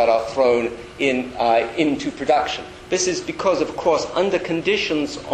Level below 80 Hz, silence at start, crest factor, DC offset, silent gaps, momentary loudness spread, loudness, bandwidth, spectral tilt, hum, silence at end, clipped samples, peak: -50 dBFS; 0 s; 16 dB; under 0.1%; none; 6 LU; -20 LUFS; 11 kHz; -3.5 dB/octave; none; 0 s; under 0.1%; -4 dBFS